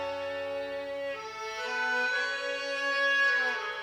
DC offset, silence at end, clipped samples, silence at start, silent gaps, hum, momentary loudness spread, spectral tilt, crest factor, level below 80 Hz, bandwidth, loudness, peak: under 0.1%; 0 s; under 0.1%; 0 s; none; 60 Hz at -75 dBFS; 12 LU; -1 dB/octave; 14 dB; -72 dBFS; 16 kHz; -30 LUFS; -18 dBFS